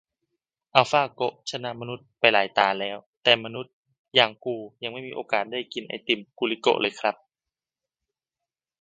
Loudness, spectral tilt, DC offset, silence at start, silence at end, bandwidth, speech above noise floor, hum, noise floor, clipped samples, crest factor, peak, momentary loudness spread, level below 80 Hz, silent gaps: -24 LUFS; -3.5 dB/octave; under 0.1%; 0.75 s; 1.7 s; 9.2 kHz; over 65 dB; none; under -90 dBFS; under 0.1%; 26 dB; 0 dBFS; 14 LU; -74 dBFS; 3.06-3.21 s, 3.73-3.83 s, 3.99-4.05 s